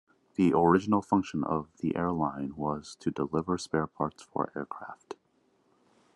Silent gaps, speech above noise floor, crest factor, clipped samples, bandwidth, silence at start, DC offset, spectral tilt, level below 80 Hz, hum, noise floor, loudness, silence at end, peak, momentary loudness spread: none; 40 dB; 20 dB; under 0.1%; 11.5 kHz; 0.4 s; under 0.1%; -7 dB/octave; -64 dBFS; none; -70 dBFS; -30 LUFS; 1 s; -10 dBFS; 16 LU